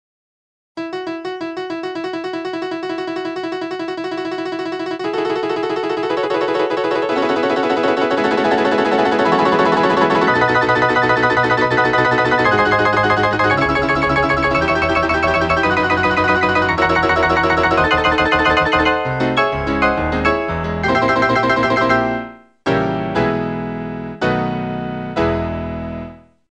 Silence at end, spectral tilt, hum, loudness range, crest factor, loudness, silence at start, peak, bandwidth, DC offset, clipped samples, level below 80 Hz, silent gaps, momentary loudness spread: 0.35 s; -6 dB/octave; none; 9 LU; 16 dB; -16 LUFS; 0.75 s; 0 dBFS; 9.6 kHz; 0.1%; under 0.1%; -38 dBFS; none; 10 LU